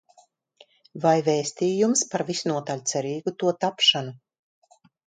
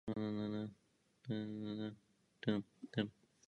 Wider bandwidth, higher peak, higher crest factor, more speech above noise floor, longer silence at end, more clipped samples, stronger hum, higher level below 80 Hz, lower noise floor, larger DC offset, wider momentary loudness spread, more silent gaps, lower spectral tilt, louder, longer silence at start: first, 9.6 kHz vs 8 kHz; first, -6 dBFS vs -22 dBFS; about the same, 20 dB vs 22 dB; about the same, 36 dB vs 35 dB; first, 0.9 s vs 0.35 s; neither; neither; about the same, -74 dBFS vs -76 dBFS; second, -60 dBFS vs -77 dBFS; neither; about the same, 9 LU vs 9 LU; neither; second, -3.5 dB/octave vs -7.5 dB/octave; first, -23 LUFS vs -44 LUFS; first, 0.95 s vs 0.05 s